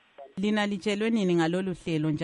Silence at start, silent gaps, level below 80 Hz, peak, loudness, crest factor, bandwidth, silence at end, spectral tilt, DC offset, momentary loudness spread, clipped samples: 0.2 s; none; -62 dBFS; -14 dBFS; -27 LUFS; 14 dB; 11 kHz; 0 s; -6.5 dB/octave; under 0.1%; 6 LU; under 0.1%